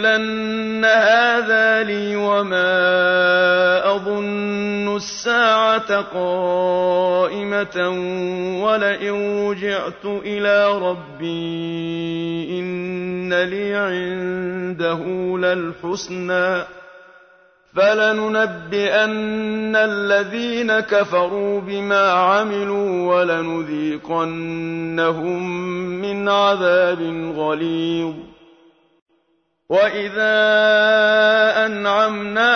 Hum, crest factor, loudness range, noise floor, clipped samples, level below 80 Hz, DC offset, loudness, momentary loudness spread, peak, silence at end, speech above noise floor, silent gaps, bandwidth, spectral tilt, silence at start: none; 16 dB; 6 LU; -66 dBFS; under 0.1%; -58 dBFS; under 0.1%; -18 LUFS; 10 LU; -4 dBFS; 0 s; 47 dB; 29.02-29.06 s; 6.6 kHz; -5 dB/octave; 0 s